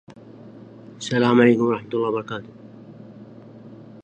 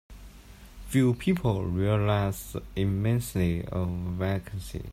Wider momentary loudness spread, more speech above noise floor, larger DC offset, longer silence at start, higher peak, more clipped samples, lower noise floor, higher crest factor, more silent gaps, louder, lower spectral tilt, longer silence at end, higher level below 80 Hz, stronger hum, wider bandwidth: first, 28 LU vs 11 LU; about the same, 23 dB vs 21 dB; neither; about the same, 0.1 s vs 0.1 s; first, -2 dBFS vs -12 dBFS; neither; second, -43 dBFS vs -48 dBFS; first, 22 dB vs 16 dB; neither; first, -20 LUFS vs -28 LUFS; about the same, -6.5 dB/octave vs -7 dB/octave; about the same, 0.05 s vs 0 s; second, -68 dBFS vs -44 dBFS; neither; second, 8.8 kHz vs 16 kHz